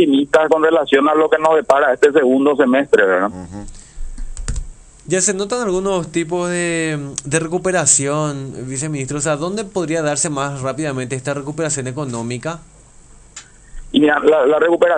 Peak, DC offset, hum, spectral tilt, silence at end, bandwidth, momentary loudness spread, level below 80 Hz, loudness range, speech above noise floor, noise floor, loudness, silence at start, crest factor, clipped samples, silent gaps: 0 dBFS; under 0.1%; none; -4 dB/octave; 0 s; 10.5 kHz; 14 LU; -36 dBFS; 8 LU; 27 dB; -43 dBFS; -16 LUFS; 0 s; 16 dB; under 0.1%; none